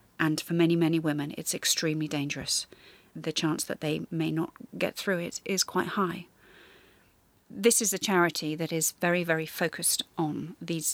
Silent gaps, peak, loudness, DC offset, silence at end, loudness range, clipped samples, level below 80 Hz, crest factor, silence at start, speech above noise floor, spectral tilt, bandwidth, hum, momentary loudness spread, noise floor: none; -10 dBFS; -28 LUFS; under 0.1%; 0 s; 4 LU; under 0.1%; -68 dBFS; 20 dB; 0.2 s; 35 dB; -3.5 dB/octave; 17.5 kHz; none; 9 LU; -64 dBFS